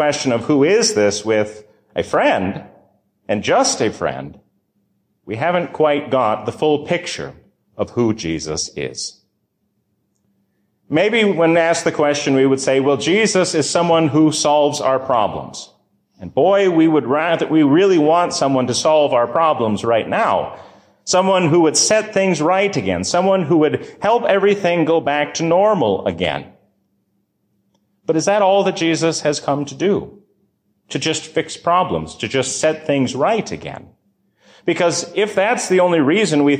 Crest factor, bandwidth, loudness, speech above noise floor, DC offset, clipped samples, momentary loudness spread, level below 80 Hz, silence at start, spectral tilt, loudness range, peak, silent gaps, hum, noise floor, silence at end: 14 dB; 13.5 kHz; -16 LUFS; 52 dB; under 0.1%; under 0.1%; 11 LU; -52 dBFS; 0 s; -4.5 dB/octave; 6 LU; -4 dBFS; none; none; -68 dBFS; 0 s